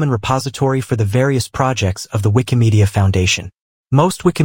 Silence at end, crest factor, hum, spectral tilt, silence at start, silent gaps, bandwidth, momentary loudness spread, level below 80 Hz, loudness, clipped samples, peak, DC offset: 0 s; 16 dB; none; -6 dB/octave; 0 s; 3.61-3.84 s; 17 kHz; 5 LU; -40 dBFS; -16 LUFS; under 0.1%; 0 dBFS; under 0.1%